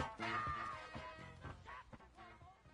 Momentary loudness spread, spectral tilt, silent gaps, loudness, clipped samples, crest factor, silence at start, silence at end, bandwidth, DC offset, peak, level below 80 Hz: 18 LU; -5 dB/octave; none; -47 LUFS; under 0.1%; 20 dB; 0 s; 0 s; 10 kHz; under 0.1%; -28 dBFS; -64 dBFS